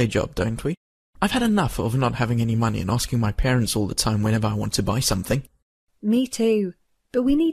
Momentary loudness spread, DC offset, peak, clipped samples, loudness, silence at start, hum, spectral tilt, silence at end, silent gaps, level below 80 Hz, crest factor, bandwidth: 6 LU; under 0.1%; -6 dBFS; under 0.1%; -23 LUFS; 0 s; none; -5.5 dB/octave; 0 s; 0.77-1.13 s, 5.62-5.87 s; -38 dBFS; 16 dB; 14 kHz